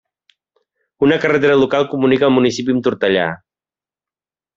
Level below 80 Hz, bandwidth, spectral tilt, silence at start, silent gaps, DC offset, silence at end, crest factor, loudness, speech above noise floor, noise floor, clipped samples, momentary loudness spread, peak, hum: -54 dBFS; 7.6 kHz; -6 dB/octave; 1 s; none; under 0.1%; 1.2 s; 16 dB; -15 LUFS; over 76 dB; under -90 dBFS; under 0.1%; 5 LU; 0 dBFS; none